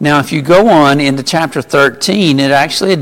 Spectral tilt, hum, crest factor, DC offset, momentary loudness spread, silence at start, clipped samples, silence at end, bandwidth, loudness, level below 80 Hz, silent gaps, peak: -5 dB/octave; none; 10 dB; under 0.1%; 6 LU; 0 s; under 0.1%; 0 s; 17 kHz; -10 LUFS; -46 dBFS; none; 0 dBFS